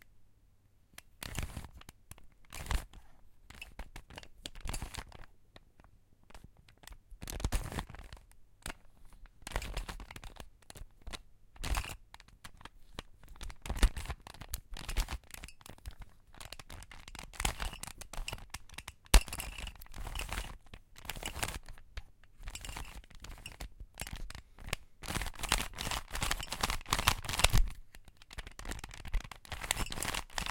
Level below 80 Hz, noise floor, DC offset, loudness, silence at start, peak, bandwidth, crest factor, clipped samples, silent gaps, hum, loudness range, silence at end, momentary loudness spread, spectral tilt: -42 dBFS; -65 dBFS; under 0.1%; -39 LUFS; 0.05 s; -4 dBFS; 17 kHz; 36 dB; under 0.1%; none; none; 13 LU; 0 s; 21 LU; -2.5 dB/octave